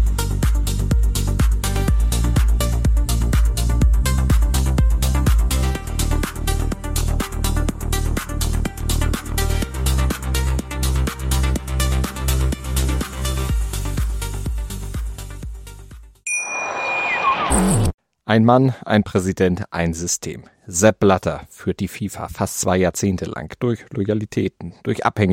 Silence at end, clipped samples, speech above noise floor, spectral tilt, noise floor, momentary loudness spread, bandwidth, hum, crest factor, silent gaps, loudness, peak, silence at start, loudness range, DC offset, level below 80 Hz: 0 s; under 0.1%; 20 dB; -5 dB/octave; -40 dBFS; 9 LU; 16.5 kHz; none; 18 dB; 17.94-17.98 s; -21 LUFS; -2 dBFS; 0 s; 5 LU; under 0.1%; -22 dBFS